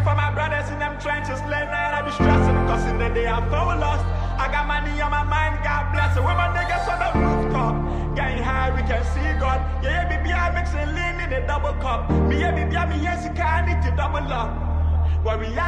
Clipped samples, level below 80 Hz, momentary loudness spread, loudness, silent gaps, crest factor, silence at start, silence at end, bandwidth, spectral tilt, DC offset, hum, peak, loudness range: under 0.1%; -26 dBFS; 5 LU; -22 LUFS; none; 18 dB; 0 s; 0 s; 9 kHz; -7 dB/octave; under 0.1%; none; -4 dBFS; 2 LU